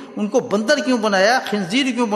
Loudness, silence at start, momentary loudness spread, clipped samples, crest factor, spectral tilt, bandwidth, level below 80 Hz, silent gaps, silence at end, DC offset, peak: -18 LUFS; 0 s; 5 LU; under 0.1%; 16 dB; -4 dB/octave; 12.5 kHz; -68 dBFS; none; 0 s; under 0.1%; -2 dBFS